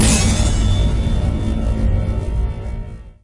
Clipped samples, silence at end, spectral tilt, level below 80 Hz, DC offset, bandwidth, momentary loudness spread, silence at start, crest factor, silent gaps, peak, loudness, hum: under 0.1%; 0.1 s; -5 dB/octave; -20 dBFS; under 0.1%; 11.5 kHz; 13 LU; 0 s; 12 dB; none; -4 dBFS; -19 LUFS; none